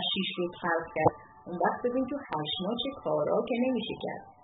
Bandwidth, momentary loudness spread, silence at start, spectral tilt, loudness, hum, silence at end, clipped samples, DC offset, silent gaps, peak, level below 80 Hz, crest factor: 4.2 kHz; 7 LU; 0 s; -3 dB/octave; -31 LUFS; none; 0.1 s; under 0.1%; under 0.1%; none; -8 dBFS; -62 dBFS; 22 dB